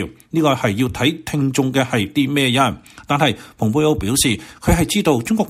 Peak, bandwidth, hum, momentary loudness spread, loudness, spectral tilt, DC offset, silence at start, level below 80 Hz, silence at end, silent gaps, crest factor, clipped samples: -2 dBFS; 16 kHz; none; 5 LU; -18 LUFS; -4.5 dB/octave; under 0.1%; 0 s; -36 dBFS; 0 s; none; 16 dB; under 0.1%